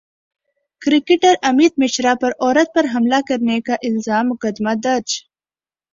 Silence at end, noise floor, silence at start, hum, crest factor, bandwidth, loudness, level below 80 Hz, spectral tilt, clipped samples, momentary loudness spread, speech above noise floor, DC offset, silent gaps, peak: 0.75 s; under -90 dBFS; 0.8 s; none; 16 dB; 7.6 kHz; -17 LUFS; -60 dBFS; -3.5 dB/octave; under 0.1%; 7 LU; over 74 dB; under 0.1%; none; -2 dBFS